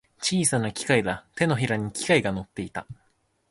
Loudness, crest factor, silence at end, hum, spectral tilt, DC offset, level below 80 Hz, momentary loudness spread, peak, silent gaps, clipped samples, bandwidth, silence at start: -25 LUFS; 20 dB; 0.55 s; none; -4 dB/octave; under 0.1%; -54 dBFS; 12 LU; -6 dBFS; none; under 0.1%; 12 kHz; 0.2 s